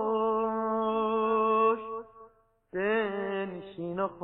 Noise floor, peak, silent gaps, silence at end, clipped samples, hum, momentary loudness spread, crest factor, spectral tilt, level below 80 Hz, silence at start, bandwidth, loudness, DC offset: -60 dBFS; -14 dBFS; none; 0 s; under 0.1%; none; 13 LU; 16 dB; -9.5 dB/octave; -64 dBFS; 0 s; 4 kHz; -29 LUFS; under 0.1%